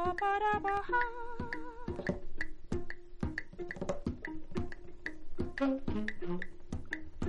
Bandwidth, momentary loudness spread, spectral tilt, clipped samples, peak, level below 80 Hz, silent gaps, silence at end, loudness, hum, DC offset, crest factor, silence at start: 8 kHz; 13 LU; -6.5 dB/octave; under 0.1%; -18 dBFS; -46 dBFS; none; 0 s; -38 LUFS; none; under 0.1%; 18 dB; 0 s